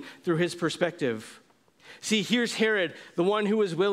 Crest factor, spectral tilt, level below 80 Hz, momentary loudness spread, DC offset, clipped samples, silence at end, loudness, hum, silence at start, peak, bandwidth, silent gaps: 18 dB; -4.5 dB/octave; -74 dBFS; 7 LU; under 0.1%; under 0.1%; 0 s; -27 LUFS; none; 0 s; -8 dBFS; 15.5 kHz; none